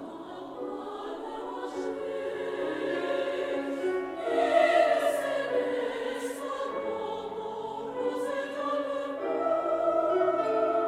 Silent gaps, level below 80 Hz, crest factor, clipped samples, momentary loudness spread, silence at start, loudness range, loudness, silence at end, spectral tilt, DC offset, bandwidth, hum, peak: none; -68 dBFS; 18 dB; under 0.1%; 12 LU; 0 s; 6 LU; -30 LUFS; 0 s; -4 dB/octave; under 0.1%; 15 kHz; none; -12 dBFS